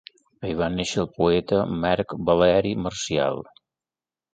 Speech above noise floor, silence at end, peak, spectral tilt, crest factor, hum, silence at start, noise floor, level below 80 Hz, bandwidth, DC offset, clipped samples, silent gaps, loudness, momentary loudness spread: over 68 dB; 0.9 s; -4 dBFS; -5.5 dB/octave; 20 dB; none; 0.4 s; under -90 dBFS; -48 dBFS; 9.4 kHz; under 0.1%; under 0.1%; none; -23 LUFS; 8 LU